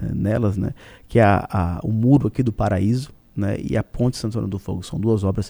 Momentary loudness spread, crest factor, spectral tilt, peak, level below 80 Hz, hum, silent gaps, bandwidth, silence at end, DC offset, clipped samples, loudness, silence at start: 10 LU; 18 dB; -8 dB/octave; -2 dBFS; -38 dBFS; none; none; over 20 kHz; 0 s; under 0.1%; under 0.1%; -21 LUFS; 0 s